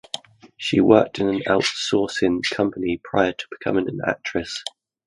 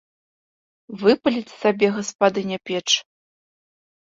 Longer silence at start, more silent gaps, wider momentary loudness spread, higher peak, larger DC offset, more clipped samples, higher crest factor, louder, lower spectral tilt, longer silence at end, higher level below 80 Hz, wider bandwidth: second, 0.15 s vs 0.9 s; second, none vs 2.15-2.19 s; first, 13 LU vs 8 LU; first, 0 dBFS vs -4 dBFS; neither; neither; about the same, 22 dB vs 20 dB; about the same, -21 LUFS vs -21 LUFS; first, -5 dB/octave vs -3.5 dB/octave; second, 0.4 s vs 1.15 s; first, -52 dBFS vs -66 dBFS; first, 11.5 kHz vs 8 kHz